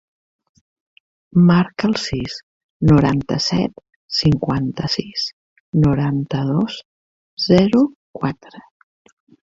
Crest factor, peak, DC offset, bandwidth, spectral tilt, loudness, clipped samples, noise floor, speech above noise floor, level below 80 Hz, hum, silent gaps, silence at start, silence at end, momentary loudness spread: 18 dB; -2 dBFS; under 0.1%; 7.8 kHz; -6.5 dB/octave; -18 LUFS; under 0.1%; under -90 dBFS; over 73 dB; -42 dBFS; none; 2.43-2.80 s, 3.96-4.08 s, 5.33-5.73 s, 6.85-7.37 s, 7.95-8.14 s; 1.35 s; 0.85 s; 12 LU